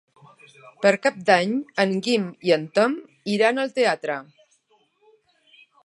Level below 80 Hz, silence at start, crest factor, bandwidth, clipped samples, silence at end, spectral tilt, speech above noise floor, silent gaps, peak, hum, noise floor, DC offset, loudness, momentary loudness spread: -76 dBFS; 0.8 s; 22 dB; 11.5 kHz; under 0.1%; 1.6 s; -5 dB/octave; 42 dB; none; -2 dBFS; none; -64 dBFS; under 0.1%; -22 LUFS; 8 LU